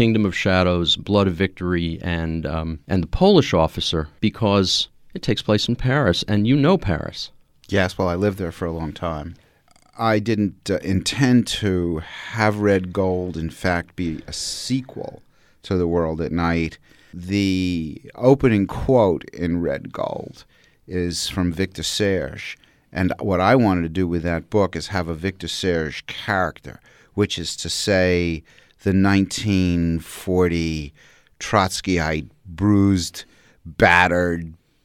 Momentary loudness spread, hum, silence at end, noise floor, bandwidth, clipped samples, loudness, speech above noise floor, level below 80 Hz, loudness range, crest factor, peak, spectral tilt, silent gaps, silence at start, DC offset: 12 LU; none; 0.3 s; -55 dBFS; 16 kHz; under 0.1%; -21 LUFS; 35 dB; -40 dBFS; 5 LU; 20 dB; 0 dBFS; -5.5 dB/octave; none; 0 s; under 0.1%